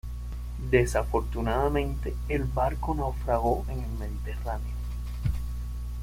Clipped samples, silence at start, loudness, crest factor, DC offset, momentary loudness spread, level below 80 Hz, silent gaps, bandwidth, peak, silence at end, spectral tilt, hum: under 0.1%; 0.05 s; -30 LUFS; 20 dB; under 0.1%; 10 LU; -32 dBFS; none; 16 kHz; -8 dBFS; 0 s; -7 dB/octave; 60 Hz at -30 dBFS